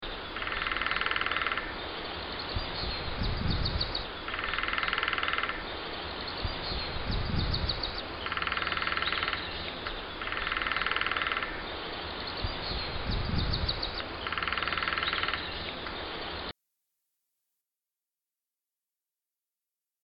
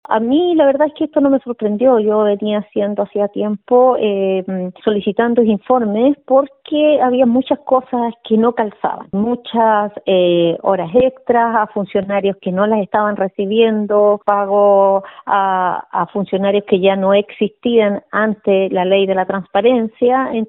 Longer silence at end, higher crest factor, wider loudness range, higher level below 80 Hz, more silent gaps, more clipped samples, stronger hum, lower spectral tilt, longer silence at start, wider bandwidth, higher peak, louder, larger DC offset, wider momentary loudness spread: first, 3.55 s vs 0.05 s; first, 22 dB vs 14 dB; about the same, 3 LU vs 2 LU; first, -42 dBFS vs -56 dBFS; neither; neither; neither; second, -7 dB/octave vs -10 dB/octave; about the same, 0 s vs 0.1 s; first, 5.8 kHz vs 4 kHz; second, -12 dBFS vs 0 dBFS; second, -32 LUFS vs -15 LUFS; neither; about the same, 8 LU vs 7 LU